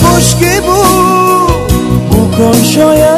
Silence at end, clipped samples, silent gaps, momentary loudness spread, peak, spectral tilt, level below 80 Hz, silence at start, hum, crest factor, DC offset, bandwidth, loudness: 0 s; 2%; none; 4 LU; 0 dBFS; -5 dB/octave; -20 dBFS; 0 s; none; 6 dB; under 0.1%; 16 kHz; -8 LUFS